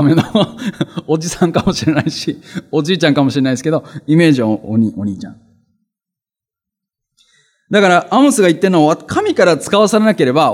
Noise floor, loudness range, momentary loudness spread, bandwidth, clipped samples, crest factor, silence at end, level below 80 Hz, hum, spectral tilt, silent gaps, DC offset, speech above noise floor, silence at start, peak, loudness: -87 dBFS; 7 LU; 11 LU; 15.5 kHz; under 0.1%; 14 dB; 0 s; -48 dBFS; none; -5.5 dB/octave; none; under 0.1%; 74 dB; 0 s; 0 dBFS; -13 LUFS